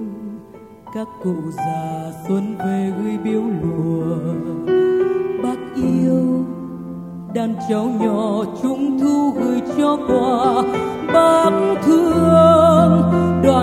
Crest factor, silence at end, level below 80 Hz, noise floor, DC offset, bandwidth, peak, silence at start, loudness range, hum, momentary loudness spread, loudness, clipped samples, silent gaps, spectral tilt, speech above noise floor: 16 dB; 0 s; -46 dBFS; -39 dBFS; under 0.1%; 14.5 kHz; 0 dBFS; 0 s; 8 LU; none; 14 LU; -17 LUFS; under 0.1%; none; -7.5 dB/octave; 23 dB